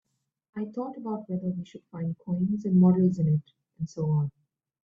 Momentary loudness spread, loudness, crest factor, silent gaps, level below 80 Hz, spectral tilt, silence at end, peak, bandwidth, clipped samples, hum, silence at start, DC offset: 16 LU; -28 LUFS; 18 dB; none; -64 dBFS; -10.5 dB/octave; 0.55 s; -10 dBFS; 7 kHz; under 0.1%; none; 0.55 s; under 0.1%